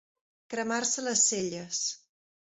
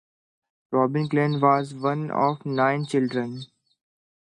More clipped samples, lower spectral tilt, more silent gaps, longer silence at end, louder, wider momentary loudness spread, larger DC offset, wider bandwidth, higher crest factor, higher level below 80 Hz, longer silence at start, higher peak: neither; second, -1.5 dB/octave vs -7.5 dB/octave; neither; second, 0.55 s vs 0.8 s; second, -28 LUFS vs -24 LUFS; first, 12 LU vs 7 LU; neither; second, 8.4 kHz vs 10.5 kHz; about the same, 20 dB vs 20 dB; about the same, -74 dBFS vs -72 dBFS; second, 0.5 s vs 0.7 s; second, -12 dBFS vs -6 dBFS